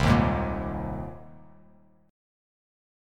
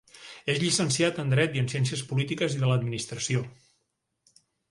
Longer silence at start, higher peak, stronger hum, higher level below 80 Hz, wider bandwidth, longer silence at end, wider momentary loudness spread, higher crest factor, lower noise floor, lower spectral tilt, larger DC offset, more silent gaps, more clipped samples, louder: second, 0 s vs 0.15 s; first, -6 dBFS vs -10 dBFS; neither; first, -38 dBFS vs -60 dBFS; first, 14.5 kHz vs 11.5 kHz; first, 1.75 s vs 1.2 s; first, 18 LU vs 8 LU; about the same, 22 dB vs 18 dB; second, -58 dBFS vs -78 dBFS; first, -7 dB/octave vs -4.5 dB/octave; neither; neither; neither; about the same, -28 LUFS vs -27 LUFS